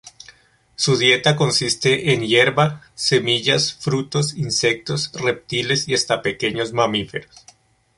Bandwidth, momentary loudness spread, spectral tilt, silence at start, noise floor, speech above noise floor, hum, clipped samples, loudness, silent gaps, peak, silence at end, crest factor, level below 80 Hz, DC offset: 11.5 kHz; 8 LU; -3.5 dB/octave; 0.05 s; -51 dBFS; 31 dB; none; under 0.1%; -18 LUFS; none; -2 dBFS; 0.75 s; 18 dB; -54 dBFS; under 0.1%